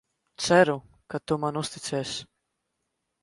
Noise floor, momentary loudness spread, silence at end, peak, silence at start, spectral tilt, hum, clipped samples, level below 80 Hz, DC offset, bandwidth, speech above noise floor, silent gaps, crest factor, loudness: -80 dBFS; 16 LU; 1 s; -8 dBFS; 0.4 s; -4.5 dB/octave; none; under 0.1%; -62 dBFS; under 0.1%; 11.5 kHz; 55 dB; none; 22 dB; -26 LUFS